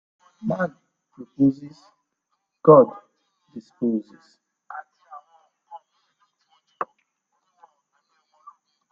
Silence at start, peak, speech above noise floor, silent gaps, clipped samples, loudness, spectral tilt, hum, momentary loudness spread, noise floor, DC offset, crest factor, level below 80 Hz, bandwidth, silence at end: 0.45 s; 0 dBFS; 57 dB; none; under 0.1%; -21 LUFS; -10 dB/octave; none; 29 LU; -77 dBFS; under 0.1%; 26 dB; -70 dBFS; 6.6 kHz; 2.05 s